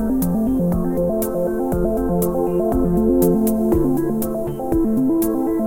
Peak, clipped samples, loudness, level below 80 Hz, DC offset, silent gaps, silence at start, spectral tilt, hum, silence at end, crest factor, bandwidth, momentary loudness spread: -4 dBFS; under 0.1%; -19 LUFS; -32 dBFS; 0.4%; none; 0 s; -8 dB/octave; none; 0 s; 14 dB; 17 kHz; 5 LU